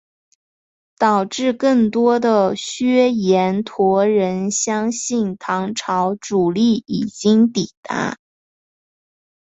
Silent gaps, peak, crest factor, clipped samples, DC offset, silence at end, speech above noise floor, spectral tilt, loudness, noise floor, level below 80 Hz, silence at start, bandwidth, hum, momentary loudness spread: 7.77-7.83 s; -2 dBFS; 16 dB; under 0.1%; under 0.1%; 1.3 s; over 73 dB; -5 dB/octave; -18 LUFS; under -90 dBFS; -60 dBFS; 1 s; 8.2 kHz; none; 8 LU